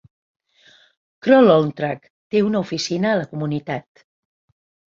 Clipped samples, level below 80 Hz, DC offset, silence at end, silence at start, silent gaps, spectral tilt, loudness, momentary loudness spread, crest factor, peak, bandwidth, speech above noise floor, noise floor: under 0.1%; -62 dBFS; under 0.1%; 1.05 s; 1.25 s; 2.10-2.30 s; -6 dB/octave; -19 LUFS; 14 LU; 18 dB; -2 dBFS; 7.6 kHz; 36 dB; -54 dBFS